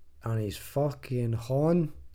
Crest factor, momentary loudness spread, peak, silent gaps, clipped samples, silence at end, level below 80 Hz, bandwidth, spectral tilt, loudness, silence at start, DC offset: 16 dB; 7 LU; -14 dBFS; none; under 0.1%; 0 s; -52 dBFS; 17 kHz; -8 dB/octave; -30 LUFS; 0 s; under 0.1%